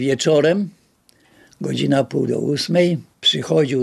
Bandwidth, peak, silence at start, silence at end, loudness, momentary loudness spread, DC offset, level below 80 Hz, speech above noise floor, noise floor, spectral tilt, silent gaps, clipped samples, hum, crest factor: 13.5 kHz; -4 dBFS; 0 s; 0 s; -18 LUFS; 8 LU; under 0.1%; -62 dBFS; 39 dB; -57 dBFS; -5 dB/octave; none; under 0.1%; none; 16 dB